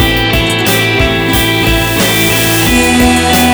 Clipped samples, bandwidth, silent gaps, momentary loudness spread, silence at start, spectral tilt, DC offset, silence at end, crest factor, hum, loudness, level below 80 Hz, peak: under 0.1%; over 20 kHz; none; 2 LU; 0 s; -3.5 dB/octave; under 0.1%; 0 s; 10 dB; none; -9 LUFS; -22 dBFS; 0 dBFS